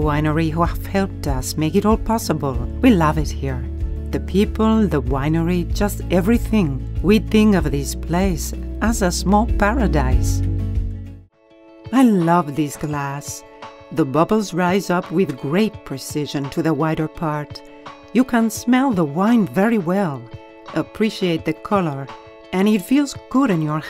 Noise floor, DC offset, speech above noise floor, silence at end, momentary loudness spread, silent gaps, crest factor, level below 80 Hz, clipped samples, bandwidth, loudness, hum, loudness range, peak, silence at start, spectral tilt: -48 dBFS; under 0.1%; 30 dB; 0 s; 11 LU; none; 18 dB; -28 dBFS; under 0.1%; 16 kHz; -19 LUFS; none; 3 LU; 0 dBFS; 0 s; -6 dB/octave